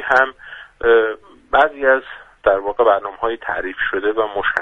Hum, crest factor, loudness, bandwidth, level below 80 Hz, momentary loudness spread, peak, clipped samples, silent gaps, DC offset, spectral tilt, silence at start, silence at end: none; 18 dB; -18 LUFS; 7 kHz; -46 dBFS; 9 LU; 0 dBFS; under 0.1%; none; under 0.1%; -5 dB/octave; 0 s; 0 s